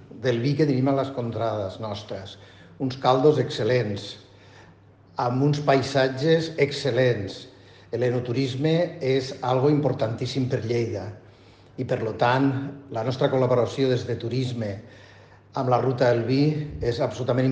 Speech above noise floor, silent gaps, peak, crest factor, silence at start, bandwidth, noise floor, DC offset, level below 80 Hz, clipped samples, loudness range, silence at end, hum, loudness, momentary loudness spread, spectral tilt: 29 dB; none; -6 dBFS; 18 dB; 0 s; 9 kHz; -52 dBFS; under 0.1%; -56 dBFS; under 0.1%; 2 LU; 0 s; none; -24 LUFS; 13 LU; -7 dB/octave